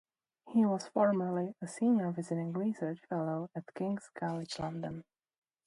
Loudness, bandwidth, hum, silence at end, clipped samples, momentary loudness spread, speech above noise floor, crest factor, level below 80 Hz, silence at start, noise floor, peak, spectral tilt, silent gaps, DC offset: -35 LUFS; 11.5 kHz; none; 0.65 s; under 0.1%; 10 LU; 20 dB; 18 dB; -74 dBFS; 0.45 s; -54 dBFS; -16 dBFS; -7 dB/octave; none; under 0.1%